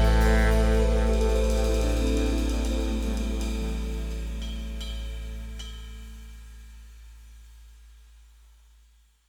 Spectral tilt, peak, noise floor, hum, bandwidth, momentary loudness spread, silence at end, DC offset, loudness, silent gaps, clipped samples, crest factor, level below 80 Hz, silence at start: -6 dB/octave; -10 dBFS; -59 dBFS; none; 14.5 kHz; 22 LU; 1.4 s; under 0.1%; -27 LUFS; none; under 0.1%; 16 dB; -28 dBFS; 0 s